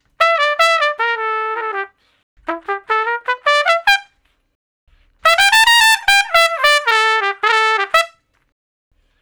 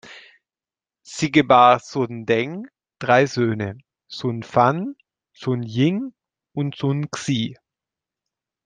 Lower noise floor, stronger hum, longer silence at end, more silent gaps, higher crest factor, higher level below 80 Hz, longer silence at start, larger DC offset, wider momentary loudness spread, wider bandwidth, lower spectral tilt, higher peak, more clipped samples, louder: second, -58 dBFS vs under -90 dBFS; neither; about the same, 1.15 s vs 1.1 s; first, 2.23-2.37 s, 4.55-4.87 s vs none; about the same, 16 dB vs 20 dB; first, -52 dBFS vs -62 dBFS; first, 0.2 s vs 0.05 s; neither; about the same, 14 LU vs 16 LU; first, over 20 kHz vs 9.6 kHz; second, 1.5 dB/octave vs -6 dB/octave; about the same, 0 dBFS vs -2 dBFS; neither; first, -13 LUFS vs -20 LUFS